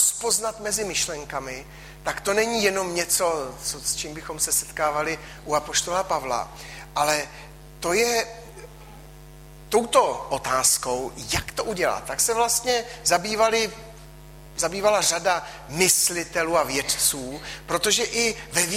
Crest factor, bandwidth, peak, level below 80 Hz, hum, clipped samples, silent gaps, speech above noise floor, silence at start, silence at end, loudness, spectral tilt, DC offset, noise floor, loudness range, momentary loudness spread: 20 dB; 16 kHz; -6 dBFS; -48 dBFS; none; under 0.1%; none; 20 dB; 0 s; 0 s; -23 LUFS; -1.5 dB/octave; under 0.1%; -44 dBFS; 4 LU; 14 LU